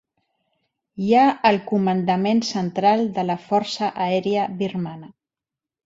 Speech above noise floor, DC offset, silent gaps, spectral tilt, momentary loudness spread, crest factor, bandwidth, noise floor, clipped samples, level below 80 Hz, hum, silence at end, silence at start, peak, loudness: 68 dB; under 0.1%; none; -6 dB/octave; 11 LU; 18 dB; 7.8 kHz; -88 dBFS; under 0.1%; -64 dBFS; none; 0.8 s; 0.95 s; -4 dBFS; -21 LUFS